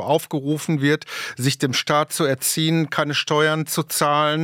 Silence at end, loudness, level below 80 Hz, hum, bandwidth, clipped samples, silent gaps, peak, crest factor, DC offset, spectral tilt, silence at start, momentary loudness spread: 0 s; -20 LUFS; -70 dBFS; none; 18 kHz; under 0.1%; none; -4 dBFS; 18 dB; under 0.1%; -4 dB/octave; 0 s; 5 LU